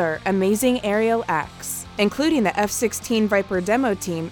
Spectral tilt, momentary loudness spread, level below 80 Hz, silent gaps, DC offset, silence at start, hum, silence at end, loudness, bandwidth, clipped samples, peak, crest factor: -4.5 dB/octave; 6 LU; -50 dBFS; none; under 0.1%; 0 s; none; 0 s; -21 LUFS; 19.5 kHz; under 0.1%; -6 dBFS; 16 dB